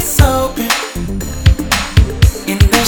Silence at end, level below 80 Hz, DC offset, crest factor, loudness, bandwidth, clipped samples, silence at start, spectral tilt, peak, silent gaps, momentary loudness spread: 0 s; -16 dBFS; under 0.1%; 12 dB; -14 LUFS; over 20 kHz; 0.6%; 0 s; -4.5 dB/octave; 0 dBFS; none; 8 LU